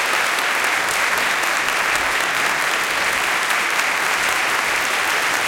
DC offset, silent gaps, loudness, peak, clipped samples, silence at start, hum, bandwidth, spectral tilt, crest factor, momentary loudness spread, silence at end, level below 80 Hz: under 0.1%; none; -17 LUFS; -2 dBFS; under 0.1%; 0 s; none; 17 kHz; 0 dB/octave; 16 dB; 1 LU; 0 s; -54 dBFS